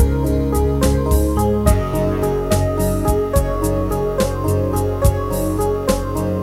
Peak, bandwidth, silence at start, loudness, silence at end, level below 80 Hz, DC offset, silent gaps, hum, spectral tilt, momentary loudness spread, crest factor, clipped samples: 0 dBFS; 16.5 kHz; 0 s; -18 LUFS; 0 s; -22 dBFS; 0.1%; none; none; -6.5 dB/octave; 3 LU; 16 dB; under 0.1%